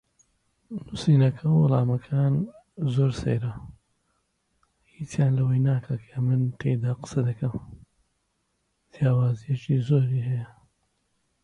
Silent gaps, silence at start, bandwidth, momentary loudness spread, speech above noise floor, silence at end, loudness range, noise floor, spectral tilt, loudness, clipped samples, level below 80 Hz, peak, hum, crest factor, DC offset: none; 0.7 s; 10 kHz; 14 LU; 50 dB; 0.95 s; 5 LU; -74 dBFS; -8.5 dB/octave; -25 LUFS; under 0.1%; -54 dBFS; -10 dBFS; none; 16 dB; under 0.1%